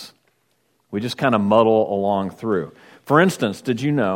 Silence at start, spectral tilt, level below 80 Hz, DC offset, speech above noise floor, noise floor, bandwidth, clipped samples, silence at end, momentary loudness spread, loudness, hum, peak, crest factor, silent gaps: 0 s; -6.5 dB/octave; -64 dBFS; under 0.1%; 47 dB; -66 dBFS; 16.5 kHz; under 0.1%; 0 s; 11 LU; -19 LUFS; none; 0 dBFS; 20 dB; none